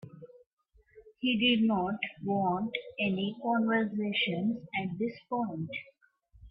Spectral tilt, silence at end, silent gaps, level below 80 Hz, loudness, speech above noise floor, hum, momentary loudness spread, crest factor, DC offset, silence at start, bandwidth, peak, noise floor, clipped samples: -9 dB/octave; 0 s; 0.46-0.57 s; -66 dBFS; -31 LUFS; 33 dB; none; 9 LU; 18 dB; under 0.1%; 0.05 s; 5.2 kHz; -14 dBFS; -63 dBFS; under 0.1%